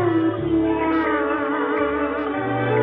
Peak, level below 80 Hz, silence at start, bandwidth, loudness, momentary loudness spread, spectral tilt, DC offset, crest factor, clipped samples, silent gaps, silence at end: -8 dBFS; -46 dBFS; 0 s; 4.1 kHz; -21 LUFS; 3 LU; -10.5 dB/octave; under 0.1%; 12 dB; under 0.1%; none; 0 s